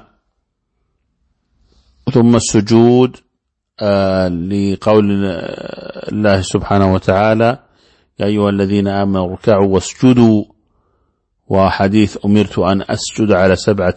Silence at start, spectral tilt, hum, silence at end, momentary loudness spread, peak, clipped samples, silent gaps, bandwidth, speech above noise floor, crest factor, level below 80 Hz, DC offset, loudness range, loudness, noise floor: 2.05 s; -6.5 dB/octave; none; 0 s; 10 LU; 0 dBFS; under 0.1%; none; 8.8 kHz; 59 dB; 14 dB; -42 dBFS; under 0.1%; 2 LU; -13 LUFS; -72 dBFS